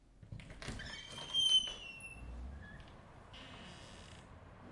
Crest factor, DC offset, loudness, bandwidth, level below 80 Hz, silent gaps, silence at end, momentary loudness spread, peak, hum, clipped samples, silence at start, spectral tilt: 20 dB; under 0.1%; -35 LUFS; 11.5 kHz; -56 dBFS; none; 0 s; 26 LU; -22 dBFS; none; under 0.1%; 0 s; -1.5 dB/octave